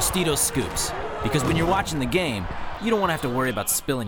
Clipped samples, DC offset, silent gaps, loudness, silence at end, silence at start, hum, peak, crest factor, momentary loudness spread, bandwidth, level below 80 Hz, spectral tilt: under 0.1%; under 0.1%; none; -24 LUFS; 0 s; 0 s; none; -8 dBFS; 16 dB; 7 LU; over 20 kHz; -40 dBFS; -4 dB/octave